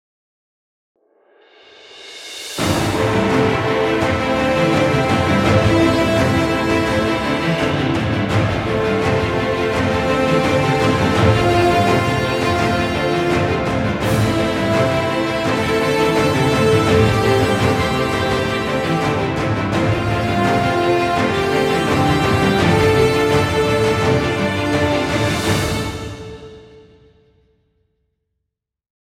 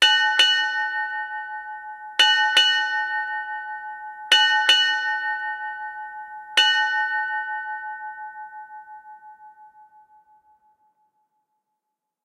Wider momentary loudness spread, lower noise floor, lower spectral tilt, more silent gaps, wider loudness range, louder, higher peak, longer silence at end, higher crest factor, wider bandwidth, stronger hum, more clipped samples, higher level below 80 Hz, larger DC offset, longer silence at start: second, 5 LU vs 20 LU; about the same, -80 dBFS vs -82 dBFS; first, -5.5 dB/octave vs 3.5 dB/octave; neither; second, 5 LU vs 14 LU; first, -16 LUFS vs -20 LUFS; about the same, -2 dBFS vs -4 dBFS; second, 2.25 s vs 2.55 s; about the same, 16 dB vs 20 dB; about the same, 16.5 kHz vs 16 kHz; neither; neither; first, -36 dBFS vs -78 dBFS; neither; first, 1.9 s vs 0 s